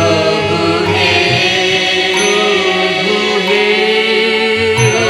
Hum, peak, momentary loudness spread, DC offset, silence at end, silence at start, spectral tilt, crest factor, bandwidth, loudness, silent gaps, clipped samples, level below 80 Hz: none; 0 dBFS; 2 LU; under 0.1%; 0 s; 0 s; -3.5 dB/octave; 12 dB; 13 kHz; -11 LUFS; none; under 0.1%; -46 dBFS